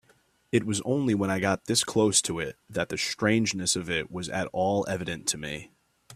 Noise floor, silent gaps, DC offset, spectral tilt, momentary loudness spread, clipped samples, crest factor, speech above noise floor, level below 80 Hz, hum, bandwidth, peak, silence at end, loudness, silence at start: -64 dBFS; none; under 0.1%; -3.5 dB/octave; 10 LU; under 0.1%; 20 dB; 37 dB; -60 dBFS; none; 15 kHz; -8 dBFS; 0 s; -27 LUFS; 0.55 s